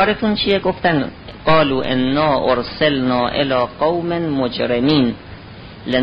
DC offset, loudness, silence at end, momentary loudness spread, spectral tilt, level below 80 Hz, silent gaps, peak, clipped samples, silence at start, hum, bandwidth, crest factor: under 0.1%; -17 LUFS; 0 s; 10 LU; -8.5 dB/octave; -40 dBFS; none; -2 dBFS; under 0.1%; 0 s; none; 5.8 kHz; 14 dB